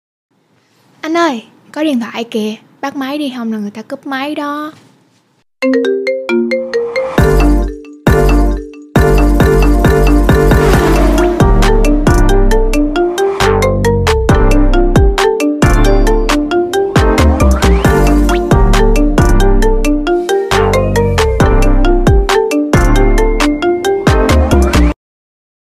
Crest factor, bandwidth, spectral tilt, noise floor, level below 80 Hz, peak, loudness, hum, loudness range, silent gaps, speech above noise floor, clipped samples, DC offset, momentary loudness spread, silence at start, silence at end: 10 dB; 15 kHz; -6 dB/octave; -55 dBFS; -14 dBFS; 0 dBFS; -12 LUFS; none; 8 LU; none; 40 dB; under 0.1%; under 0.1%; 9 LU; 1.05 s; 0.75 s